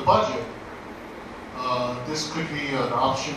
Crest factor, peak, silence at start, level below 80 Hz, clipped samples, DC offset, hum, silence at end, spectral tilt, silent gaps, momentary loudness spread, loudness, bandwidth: 22 dB; -4 dBFS; 0 s; -52 dBFS; under 0.1%; under 0.1%; none; 0 s; -4.5 dB/octave; none; 16 LU; -26 LUFS; 13.5 kHz